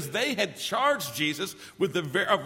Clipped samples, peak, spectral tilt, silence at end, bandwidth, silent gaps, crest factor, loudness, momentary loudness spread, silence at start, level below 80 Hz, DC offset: under 0.1%; -8 dBFS; -3.5 dB/octave; 0 s; 16.5 kHz; none; 20 dB; -28 LUFS; 6 LU; 0 s; -68 dBFS; under 0.1%